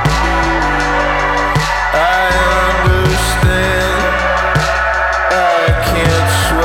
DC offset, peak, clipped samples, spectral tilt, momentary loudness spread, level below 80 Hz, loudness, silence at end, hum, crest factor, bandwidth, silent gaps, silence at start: under 0.1%; 0 dBFS; under 0.1%; -4.5 dB/octave; 2 LU; -22 dBFS; -12 LUFS; 0 s; none; 12 dB; 17 kHz; none; 0 s